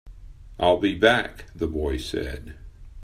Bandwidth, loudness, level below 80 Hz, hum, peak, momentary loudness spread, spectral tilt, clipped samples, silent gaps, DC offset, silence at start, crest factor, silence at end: 15.5 kHz; -23 LUFS; -40 dBFS; none; -2 dBFS; 16 LU; -5.5 dB/octave; under 0.1%; none; under 0.1%; 0.05 s; 24 dB; 0 s